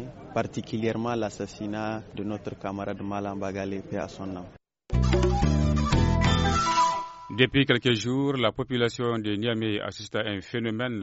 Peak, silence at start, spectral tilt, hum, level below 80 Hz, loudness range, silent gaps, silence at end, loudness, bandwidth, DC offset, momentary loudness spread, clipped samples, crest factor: -4 dBFS; 0 s; -4.5 dB/octave; none; -36 dBFS; 9 LU; none; 0 s; -27 LUFS; 8 kHz; under 0.1%; 11 LU; under 0.1%; 22 dB